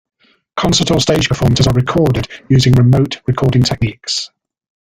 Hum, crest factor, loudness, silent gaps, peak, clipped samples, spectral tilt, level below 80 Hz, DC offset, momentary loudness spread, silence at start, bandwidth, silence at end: none; 14 dB; -13 LUFS; none; 0 dBFS; under 0.1%; -5.5 dB/octave; -34 dBFS; under 0.1%; 9 LU; 0.55 s; 15 kHz; 0.55 s